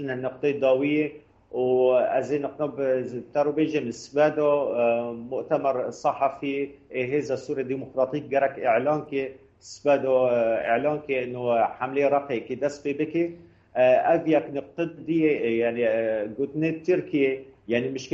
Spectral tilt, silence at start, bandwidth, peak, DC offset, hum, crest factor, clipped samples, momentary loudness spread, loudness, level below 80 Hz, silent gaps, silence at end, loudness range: -6.5 dB/octave; 0 s; 8 kHz; -10 dBFS; under 0.1%; none; 16 dB; under 0.1%; 9 LU; -25 LUFS; -66 dBFS; none; 0 s; 3 LU